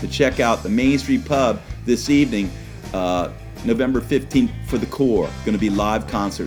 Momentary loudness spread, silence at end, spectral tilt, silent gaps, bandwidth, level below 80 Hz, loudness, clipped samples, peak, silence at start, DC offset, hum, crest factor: 7 LU; 0 s; -5.5 dB/octave; none; 18 kHz; -36 dBFS; -20 LUFS; under 0.1%; -4 dBFS; 0 s; under 0.1%; none; 16 dB